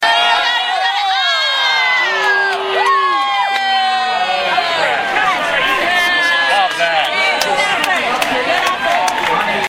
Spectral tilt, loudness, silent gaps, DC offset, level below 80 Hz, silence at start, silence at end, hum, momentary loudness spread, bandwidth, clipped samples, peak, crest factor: -1 dB/octave; -13 LUFS; none; under 0.1%; -52 dBFS; 0 s; 0 s; none; 3 LU; 16.5 kHz; under 0.1%; 0 dBFS; 14 dB